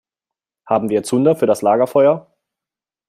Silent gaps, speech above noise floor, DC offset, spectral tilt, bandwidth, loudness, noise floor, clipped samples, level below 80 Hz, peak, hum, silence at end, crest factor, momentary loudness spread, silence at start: none; 74 dB; under 0.1%; -6.5 dB/octave; 15 kHz; -16 LUFS; -88 dBFS; under 0.1%; -64 dBFS; -2 dBFS; none; 0.9 s; 16 dB; 6 LU; 0.65 s